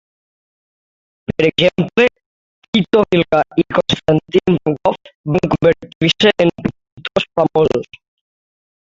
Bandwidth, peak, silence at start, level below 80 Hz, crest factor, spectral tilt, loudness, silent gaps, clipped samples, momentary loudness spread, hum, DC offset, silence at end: 7.8 kHz; 0 dBFS; 1.3 s; -46 dBFS; 16 dB; -6 dB/octave; -15 LUFS; 2.26-2.62 s, 2.68-2.73 s, 5.15-5.24 s, 5.95-6.01 s, 6.92-6.97 s; under 0.1%; 10 LU; none; under 0.1%; 1 s